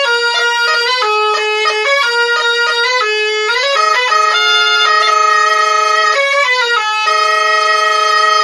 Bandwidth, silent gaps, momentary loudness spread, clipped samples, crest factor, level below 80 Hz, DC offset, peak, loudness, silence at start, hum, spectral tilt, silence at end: 11.5 kHz; none; 3 LU; under 0.1%; 10 dB; -78 dBFS; under 0.1%; 0 dBFS; -11 LUFS; 0 s; none; 3 dB/octave; 0 s